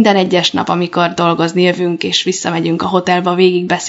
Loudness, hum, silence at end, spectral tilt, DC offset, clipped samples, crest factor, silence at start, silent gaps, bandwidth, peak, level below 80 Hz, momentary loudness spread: -13 LUFS; none; 0 s; -4.5 dB/octave; under 0.1%; under 0.1%; 14 dB; 0 s; none; 8 kHz; 0 dBFS; -58 dBFS; 5 LU